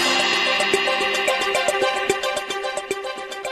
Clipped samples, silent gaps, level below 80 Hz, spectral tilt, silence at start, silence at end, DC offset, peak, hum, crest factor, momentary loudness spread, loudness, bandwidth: under 0.1%; none; -58 dBFS; -1 dB/octave; 0 s; 0 s; under 0.1%; -4 dBFS; none; 18 dB; 10 LU; -20 LUFS; 13.5 kHz